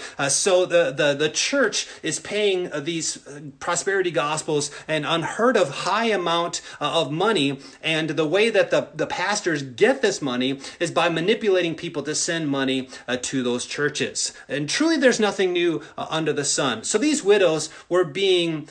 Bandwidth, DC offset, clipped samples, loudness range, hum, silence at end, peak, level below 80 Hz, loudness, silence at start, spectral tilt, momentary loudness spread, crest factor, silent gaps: 10.5 kHz; under 0.1%; under 0.1%; 3 LU; none; 0.05 s; -4 dBFS; -66 dBFS; -22 LUFS; 0 s; -3 dB/octave; 9 LU; 18 dB; none